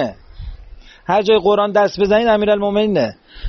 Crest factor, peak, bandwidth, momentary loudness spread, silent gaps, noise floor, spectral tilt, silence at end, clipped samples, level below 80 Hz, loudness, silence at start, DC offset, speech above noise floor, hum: 14 dB; -2 dBFS; 6.6 kHz; 23 LU; none; -39 dBFS; -4 dB/octave; 0 s; under 0.1%; -40 dBFS; -15 LUFS; 0 s; under 0.1%; 24 dB; none